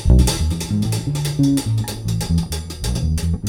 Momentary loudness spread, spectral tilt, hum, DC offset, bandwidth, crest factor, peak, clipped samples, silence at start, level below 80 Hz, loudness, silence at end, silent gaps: 7 LU; -5.5 dB/octave; none; under 0.1%; 17.5 kHz; 16 dB; -2 dBFS; under 0.1%; 0 s; -22 dBFS; -20 LUFS; 0 s; none